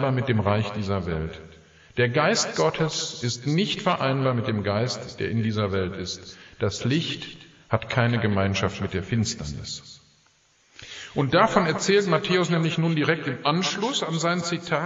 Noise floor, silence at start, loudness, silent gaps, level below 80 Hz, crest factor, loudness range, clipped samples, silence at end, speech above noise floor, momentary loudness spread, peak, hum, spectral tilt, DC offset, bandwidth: -62 dBFS; 0 s; -24 LUFS; none; -52 dBFS; 20 dB; 5 LU; under 0.1%; 0 s; 38 dB; 12 LU; -4 dBFS; none; -5 dB/octave; under 0.1%; 8 kHz